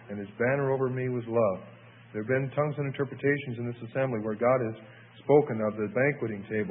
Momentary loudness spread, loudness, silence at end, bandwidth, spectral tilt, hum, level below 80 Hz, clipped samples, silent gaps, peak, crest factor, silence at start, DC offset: 12 LU; -29 LUFS; 0 s; 3.9 kHz; -11.5 dB/octave; none; -68 dBFS; under 0.1%; none; -10 dBFS; 20 dB; 0 s; under 0.1%